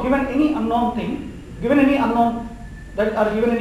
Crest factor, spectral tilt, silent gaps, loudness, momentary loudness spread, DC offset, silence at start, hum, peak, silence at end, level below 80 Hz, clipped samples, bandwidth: 16 dB; -7 dB/octave; none; -19 LUFS; 15 LU; under 0.1%; 0 s; none; -4 dBFS; 0 s; -40 dBFS; under 0.1%; 16 kHz